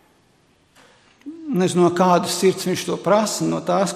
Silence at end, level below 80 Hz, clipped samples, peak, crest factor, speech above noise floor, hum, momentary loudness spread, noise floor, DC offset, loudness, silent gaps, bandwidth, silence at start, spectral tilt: 0 s; -62 dBFS; under 0.1%; -2 dBFS; 18 dB; 40 dB; none; 8 LU; -58 dBFS; under 0.1%; -19 LUFS; none; 15 kHz; 1.25 s; -5 dB/octave